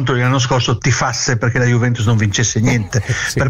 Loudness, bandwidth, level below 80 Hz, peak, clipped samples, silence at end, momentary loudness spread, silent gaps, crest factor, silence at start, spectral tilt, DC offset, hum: -15 LUFS; 12.5 kHz; -38 dBFS; -4 dBFS; under 0.1%; 0 s; 3 LU; none; 10 dB; 0 s; -4.5 dB/octave; under 0.1%; none